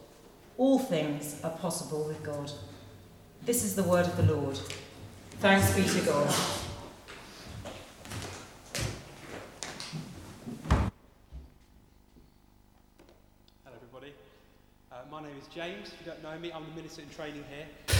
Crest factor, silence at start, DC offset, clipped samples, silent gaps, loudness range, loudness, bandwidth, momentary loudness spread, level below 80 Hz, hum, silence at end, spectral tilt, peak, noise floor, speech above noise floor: 22 dB; 0 s; under 0.1%; under 0.1%; none; 16 LU; -31 LUFS; 18.5 kHz; 22 LU; -48 dBFS; 50 Hz at -55 dBFS; 0 s; -4.5 dB/octave; -10 dBFS; -61 dBFS; 31 dB